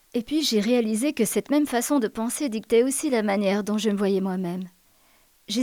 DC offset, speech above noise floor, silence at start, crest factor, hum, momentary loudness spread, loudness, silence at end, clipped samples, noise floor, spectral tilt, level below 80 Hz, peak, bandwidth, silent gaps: under 0.1%; 36 dB; 0.15 s; 14 dB; none; 7 LU; -24 LUFS; 0 s; under 0.1%; -60 dBFS; -4.5 dB/octave; -62 dBFS; -10 dBFS; 19.5 kHz; none